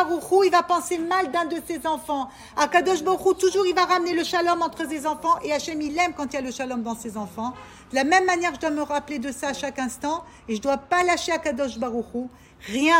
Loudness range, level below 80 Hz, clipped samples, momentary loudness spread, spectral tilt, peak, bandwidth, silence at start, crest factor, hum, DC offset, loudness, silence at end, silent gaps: 4 LU; -56 dBFS; under 0.1%; 11 LU; -3 dB/octave; -4 dBFS; 16.5 kHz; 0 s; 18 dB; none; under 0.1%; -24 LUFS; 0 s; none